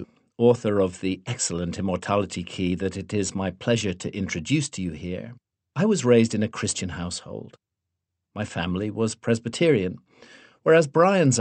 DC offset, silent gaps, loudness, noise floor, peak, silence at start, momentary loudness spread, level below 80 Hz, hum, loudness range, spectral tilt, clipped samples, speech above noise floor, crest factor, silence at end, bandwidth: under 0.1%; none; -24 LUFS; -83 dBFS; -4 dBFS; 0 s; 15 LU; -56 dBFS; none; 3 LU; -5 dB/octave; under 0.1%; 60 dB; 20 dB; 0 s; 8.8 kHz